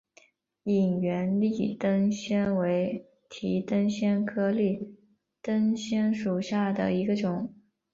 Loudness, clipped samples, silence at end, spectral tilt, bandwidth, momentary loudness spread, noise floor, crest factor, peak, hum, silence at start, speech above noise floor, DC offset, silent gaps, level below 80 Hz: -28 LUFS; under 0.1%; 0.4 s; -7 dB/octave; 7.6 kHz; 10 LU; -62 dBFS; 12 dB; -14 dBFS; none; 0.65 s; 35 dB; under 0.1%; none; -66 dBFS